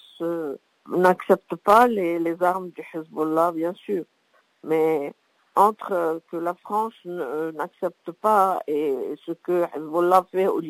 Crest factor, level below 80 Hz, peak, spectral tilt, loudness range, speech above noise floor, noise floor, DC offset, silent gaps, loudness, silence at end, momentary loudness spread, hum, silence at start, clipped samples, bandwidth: 20 dB; -70 dBFS; -4 dBFS; -6.5 dB/octave; 4 LU; 41 dB; -64 dBFS; under 0.1%; none; -23 LUFS; 0 s; 12 LU; none; 0.2 s; under 0.1%; 16 kHz